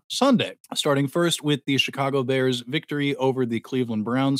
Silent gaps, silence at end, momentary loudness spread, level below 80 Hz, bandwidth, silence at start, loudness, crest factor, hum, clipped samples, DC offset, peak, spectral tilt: 0.60-0.64 s; 0 s; 6 LU; -76 dBFS; 16 kHz; 0.1 s; -23 LUFS; 16 dB; none; under 0.1%; under 0.1%; -6 dBFS; -5 dB/octave